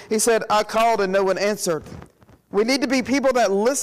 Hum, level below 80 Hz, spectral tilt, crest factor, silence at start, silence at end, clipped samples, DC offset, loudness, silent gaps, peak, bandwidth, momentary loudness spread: none; -54 dBFS; -3.5 dB/octave; 10 dB; 0 s; 0 s; under 0.1%; under 0.1%; -20 LUFS; none; -12 dBFS; 15.5 kHz; 6 LU